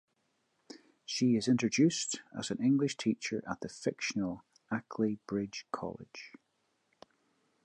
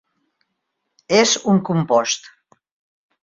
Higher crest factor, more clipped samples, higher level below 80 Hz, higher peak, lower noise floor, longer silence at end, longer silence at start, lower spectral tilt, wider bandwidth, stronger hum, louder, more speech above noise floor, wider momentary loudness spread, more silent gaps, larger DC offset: about the same, 18 dB vs 20 dB; neither; second, -72 dBFS vs -62 dBFS; second, -16 dBFS vs -2 dBFS; about the same, -78 dBFS vs -75 dBFS; first, 1.35 s vs 0.95 s; second, 0.7 s vs 1.1 s; about the same, -4.5 dB/octave vs -4 dB/octave; first, 11 kHz vs 7.8 kHz; neither; second, -33 LUFS vs -17 LUFS; second, 45 dB vs 59 dB; first, 19 LU vs 7 LU; neither; neither